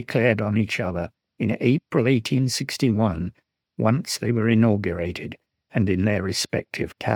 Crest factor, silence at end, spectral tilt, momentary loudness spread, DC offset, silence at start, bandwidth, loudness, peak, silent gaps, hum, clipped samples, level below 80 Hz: 18 dB; 0 s; -6 dB/octave; 10 LU; under 0.1%; 0 s; 19 kHz; -23 LUFS; -4 dBFS; none; none; under 0.1%; -54 dBFS